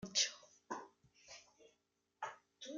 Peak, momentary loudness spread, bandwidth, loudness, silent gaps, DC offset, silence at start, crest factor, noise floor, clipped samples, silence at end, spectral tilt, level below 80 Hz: -20 dBFS; 22 LU; 9.6 kHz; -42 LUFS; none; under 0.1%; 0 s; 26 dB; -83 dBFS; under 0.1%; 0 s; 0 dB/octave; -82 dBFS